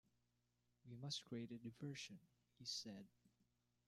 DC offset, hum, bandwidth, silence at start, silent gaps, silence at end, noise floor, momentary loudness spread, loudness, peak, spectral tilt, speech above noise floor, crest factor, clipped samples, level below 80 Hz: under 0.1%; 60 Hz at -75 dBFS; 13.5 kHz; 0.85 s; none; 0.6 s; -86 dBFS; 13 LU; -52 LUFS; -36 dBFS; -4 dB/octave; 33 dB; 20 dB; under 0.1%; -88 dBFS